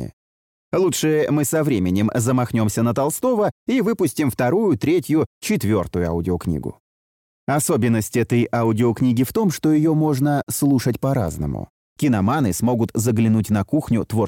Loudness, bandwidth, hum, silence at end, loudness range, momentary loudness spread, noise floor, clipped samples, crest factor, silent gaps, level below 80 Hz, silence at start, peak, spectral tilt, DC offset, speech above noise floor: -20 LUFS; 17 kHz; none; 0 s; 3 LU; 5 LU; under -90 dBFS; under 0.1%; 12 dB; 0.13-0.72 s, 3.51-3.66 s, 5.26-5.41 s, 6.80-7.47 s, 11.70-11.96 s; -46 dBFS; 0 s; -8 dBFS; -6.5 dB/octave; under 0.1%; over 71 dB